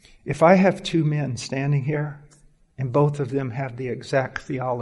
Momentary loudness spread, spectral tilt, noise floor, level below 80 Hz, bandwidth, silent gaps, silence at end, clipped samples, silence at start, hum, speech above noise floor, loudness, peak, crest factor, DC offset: 13 LU; -7 dB/octave; -55 dBFS; -54 dBFS; 11.5 kHz; none; 0 s; under 0.1%; 0.25 s; none; 33 dB; -23 LUFS; -4 dBFS; 20 dB; under 0.1%